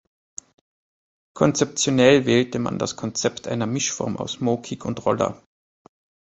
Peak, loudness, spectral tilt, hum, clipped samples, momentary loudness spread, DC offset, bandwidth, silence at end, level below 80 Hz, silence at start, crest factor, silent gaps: -2 dBFS; -22 LUFS; -4.5 dB/octave; none; under 0.1%; 12 LU; under 0.1%; 8.4 kHz; 0.95 s; -56 dBFS; 1.35 s; 20 dB; none